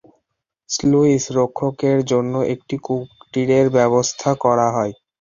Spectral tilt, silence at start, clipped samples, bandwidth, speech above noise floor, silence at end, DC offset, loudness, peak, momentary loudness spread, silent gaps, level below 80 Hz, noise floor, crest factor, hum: -5.5 dB/octave; 0.7 s; under 0.1%; 7.6 kHz; 58 dB; 0.3 s; under 0.1%; -18 LUFS; -2 dBFS; 10 LU; none; -54 dBFS; -76 dBFS; 16 dB; none